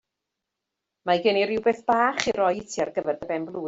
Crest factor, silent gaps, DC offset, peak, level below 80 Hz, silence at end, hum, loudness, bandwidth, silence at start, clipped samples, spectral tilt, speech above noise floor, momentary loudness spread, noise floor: 22 dB; none; under 0.1%; -4 dBFS; -62 dBFS; 0 s; none; -24 LUFS; 8 kHz; 1.05 s; under 0.1%; -4 dB/octave; 60 dB; 7 LU; -84 dBFS